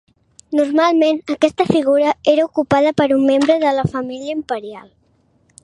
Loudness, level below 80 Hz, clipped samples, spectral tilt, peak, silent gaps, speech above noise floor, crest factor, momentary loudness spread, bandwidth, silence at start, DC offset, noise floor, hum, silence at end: -16 LUFS; -52 dBFS; under 0.1%; -6 dB/octave; 0 dBFS; none; 43 dB; 16 dB; 10 LU; 11 kHz; 0.5 s; under 0.1%; -58 dBFS; none; 0.85 s